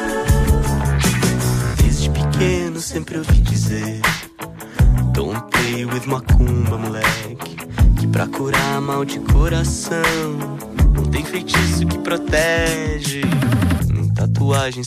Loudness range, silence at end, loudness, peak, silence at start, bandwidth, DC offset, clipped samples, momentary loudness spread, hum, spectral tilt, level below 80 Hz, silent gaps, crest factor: 1 LU; 0 s; -18 LUFS; -4 dBFS; 0 s; 16 kHz; under 0.1%; under 0.1%; 7 LU; none; -5.5 dB/octave; -22 dBFS; none; 12 dB